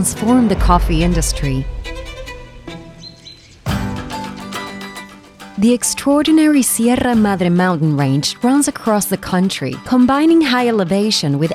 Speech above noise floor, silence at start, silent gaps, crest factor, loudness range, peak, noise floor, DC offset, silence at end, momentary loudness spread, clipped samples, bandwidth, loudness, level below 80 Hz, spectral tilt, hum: 26 dB; 0 s; none; 16 dB; 13 LU; 0 dBFS; -40 dBFS; under 0.1%; 0 s; 19 LU; under 0.1%; 15.5 kHz; -15 LUFS; -28 dBFS; -5 dB/octave; none